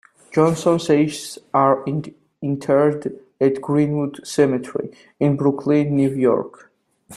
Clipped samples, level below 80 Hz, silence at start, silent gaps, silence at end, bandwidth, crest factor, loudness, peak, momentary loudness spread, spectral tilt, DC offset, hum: under 0.1%; -62 dBFS; 0.3 s; none; 0 s; 12.5 kHz; 18 dB; -20 LUFS; -2 dBFS; 12 LU; -7 dB/octave; under 0.1%; none